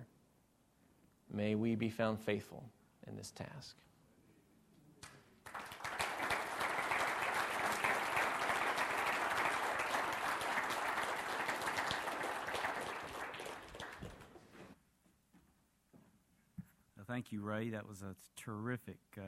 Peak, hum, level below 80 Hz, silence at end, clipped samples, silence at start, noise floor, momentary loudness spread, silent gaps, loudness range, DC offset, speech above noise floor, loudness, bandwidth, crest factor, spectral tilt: -20 dBFS; none; -70 dBFS; 0 s; under 0.1%; 0 s; -74 dBFS; 20 LU; none; 16 LU; under 0.1%; 32 dB; -39 LUFS; 16 kHz; 20 dB; -4 dB/octave